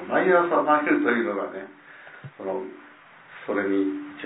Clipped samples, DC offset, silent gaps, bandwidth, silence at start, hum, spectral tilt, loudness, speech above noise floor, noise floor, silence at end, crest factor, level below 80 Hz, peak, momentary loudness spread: under 0.1%; under 0.1%; none; 4 kHz; 0 s; none; -10 dB/octave; -23 LUFS; 25 dB; -49 dBFS; 0 s; 18 dB; -78 dBFS; -6 dBFS; 22 LU